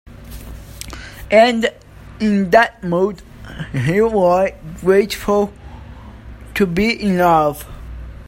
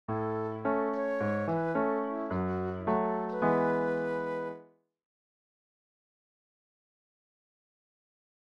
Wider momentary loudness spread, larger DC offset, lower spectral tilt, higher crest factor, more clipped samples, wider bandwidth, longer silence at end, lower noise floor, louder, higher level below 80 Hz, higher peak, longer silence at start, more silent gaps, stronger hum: first, 22 LU vs 6 LU; neither; second, -6 dB/octave vs -9 dB/octave; about the same, 18 dB vs 18 dB; neither; first, 16.5 kHz vs 7.6 kHz; second, 0.05 s vs 3.8 s; second, -36 dBFS vs -54 dBFS; first, -16 LUFS vs -31 LUFS; first, -38 dBFS vs -66 dBFS; first, 0 dBFS vs -16 dBFS; about the same, 0.1 s vs 0.1 s; neither; neither